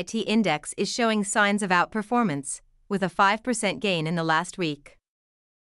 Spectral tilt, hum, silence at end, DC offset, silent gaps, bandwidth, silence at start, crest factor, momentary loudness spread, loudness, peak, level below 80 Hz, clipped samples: -4 dB/octave; none; 0.85 s; under 0.1%; none; 12 kHz; 0 s; 18 dB; 9 LU; -25 LUFS; -8 dBFS; -62 dBFS; under 0.1%